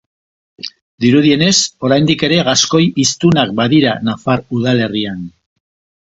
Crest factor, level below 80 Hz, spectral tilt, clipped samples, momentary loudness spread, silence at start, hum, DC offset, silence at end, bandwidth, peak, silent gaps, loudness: 14 dB; -48 dBFS; -4.5 dB/octave; under 0.1%; 17 LU; 0.65 s; none; under 0.1%; 0.8 s; 8 kHz; 0 dBFS; 0.82-0.98 s; -13 LUFS